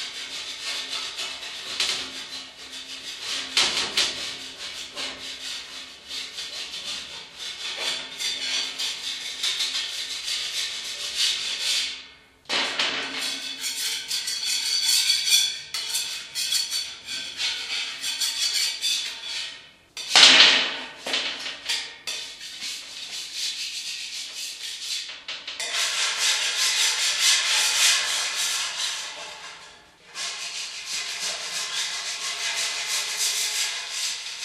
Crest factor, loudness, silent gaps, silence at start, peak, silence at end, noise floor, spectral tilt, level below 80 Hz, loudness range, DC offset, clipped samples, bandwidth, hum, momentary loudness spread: 26 dB; -23 LUFS; none; 0 s; 0 dBFS; 0 s; -49 dBFS; 2.5 dB/octave; -68 dBFS; 11 LU; under 0.1%; under 0.1%; 15.5 kHz; none; 14 LU